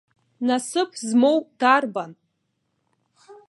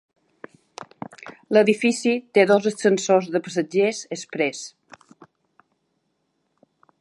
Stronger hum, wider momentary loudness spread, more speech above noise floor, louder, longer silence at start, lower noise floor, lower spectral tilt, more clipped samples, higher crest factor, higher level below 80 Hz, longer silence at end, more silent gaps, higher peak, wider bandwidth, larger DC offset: neither; second, 11 LU vs 21 LU; about the same, 53 dB vs 52 dB; about the same, -21 LUFS vs -21 LUFS; second, 0.4 s vs 0.8 s; about the same, -74 dBFS vs -72 dBFS; about the same, -3.5 dB/octave vs -4.5 dB/octave; neither; about the same, 22 dB vs 22 dB; second, -82 dBFS vs -76 dBFS; second, 0.15 s vs 2.3 s; neither; about the same, -2 dBFS vs -2 dBFS; about the same, 11.5 kHz vs 11.5 kHz; neither